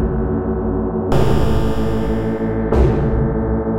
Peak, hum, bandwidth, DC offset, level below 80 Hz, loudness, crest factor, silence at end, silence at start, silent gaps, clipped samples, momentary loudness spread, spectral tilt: 0 dBFS; none; 14 kHz; under 0.1%; -22 dBFS; -18 LUFS; 16 dB; 0 s; 0 s; none; under 0.1%; 4 LU; -8.5 dB/octave